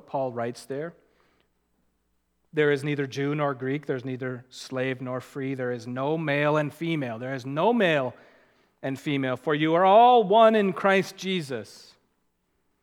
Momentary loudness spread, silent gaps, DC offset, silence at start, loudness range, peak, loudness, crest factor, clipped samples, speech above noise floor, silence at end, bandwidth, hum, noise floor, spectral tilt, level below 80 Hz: 16 LU; none; under 0.1%; 0.15 s; 9 LU; -4 dBFS; -25 LUFS; 20 dB; under 0.1%; 48 dB; 1.05 s; 15.5 kHz; none; -73 dBFS; -6 dB/octave; -78 dBFS